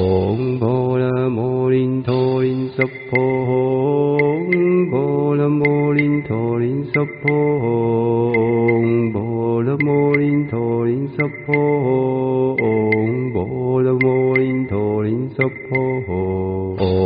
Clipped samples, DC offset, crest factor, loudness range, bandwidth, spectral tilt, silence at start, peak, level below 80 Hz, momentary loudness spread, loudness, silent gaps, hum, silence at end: under 0.1%; under 0.1%; 14 dB; 1 LU; 5 kHz; -7.5 dB/octave; 0 s; -2 dBFS; -50 dBFS; 5 LU; -18 LUFS; none; none; 0 s